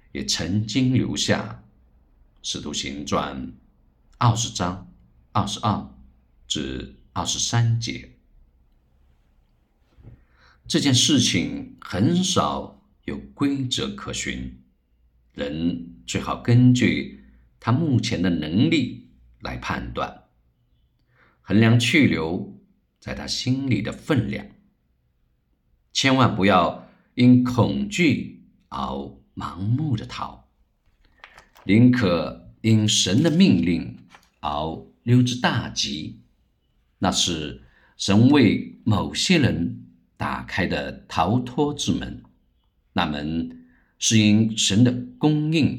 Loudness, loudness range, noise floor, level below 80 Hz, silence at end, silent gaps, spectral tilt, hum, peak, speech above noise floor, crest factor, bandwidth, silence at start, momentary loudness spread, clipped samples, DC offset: -22 LUFS; 7 LU; -67 dBFS; -48 dBFS; 0 s; none; -5 dB/octave; none; -2 dBFS; 45 dB; 20 dB; 13.5 kHz; 0.15 s; 17 LU; under 0.1%; under 0.1%